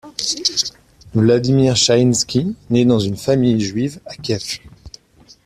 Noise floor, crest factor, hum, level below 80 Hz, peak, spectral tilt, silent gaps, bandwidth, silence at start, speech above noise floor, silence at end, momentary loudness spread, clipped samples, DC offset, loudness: -49 dBFS; 16 dB; none; -48 dBFS; -2 dBFS; -5 dB/octave; none; 14 kHz; 0.05 s; 33 dB; 0.55 s; 11 LU; under 0.1%; under 0.1%; -17 LUFS